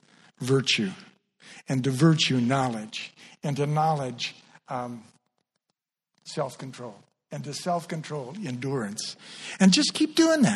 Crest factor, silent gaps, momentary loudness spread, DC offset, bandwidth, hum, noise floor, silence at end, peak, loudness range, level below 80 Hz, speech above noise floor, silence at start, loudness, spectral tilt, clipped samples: 20 dB; none; 19 LU; under 0.1%; 13 kHz; none; -82 dBFS; 0 s; -6 dBFS; 11 LU; -68 dBFS; 57 dB; 0.4 s; -26 LUFS; -5 dB/octave; under 0.1%